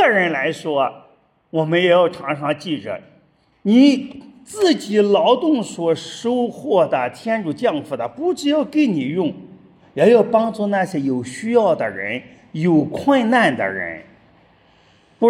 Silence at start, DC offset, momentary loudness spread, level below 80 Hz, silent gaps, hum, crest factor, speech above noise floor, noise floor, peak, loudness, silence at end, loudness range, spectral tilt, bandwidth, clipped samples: 0 s; under 0.1%; 12 LU; -66 dBFS; none; none; 16 dB; 39 dB; -56 dBFS; -2 dBFS; -18 LUFS; 0 s; 3 LU; -6 dB/octave; 12.5 kHz; under 0.1%